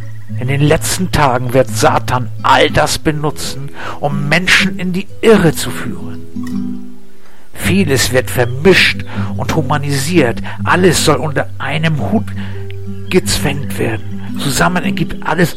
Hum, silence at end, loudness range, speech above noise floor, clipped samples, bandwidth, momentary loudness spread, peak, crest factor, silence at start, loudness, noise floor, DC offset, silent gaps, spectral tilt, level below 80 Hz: none; 0 s; 4 LU; 30 dB; under 0.1%; 16.5 kHz; 15 LU; 0 dBFS; 14 dB; 0 s; -13 LUFS; -44 dBFS; 8%; none; -4.5 dB/octave; -34 dBFS